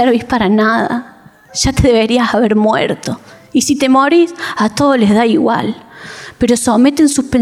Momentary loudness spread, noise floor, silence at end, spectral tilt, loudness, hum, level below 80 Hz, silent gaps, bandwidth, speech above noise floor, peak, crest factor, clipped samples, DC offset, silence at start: 12 LU; -31 dBFS; 0 s; -4.5 dB/octave; -12 LUFS; none; -34 dBFS; none; 15.5 kHz; 20 dB; -2 dBFS; 10 dB; under 0.1%; under 0.1%; 0 s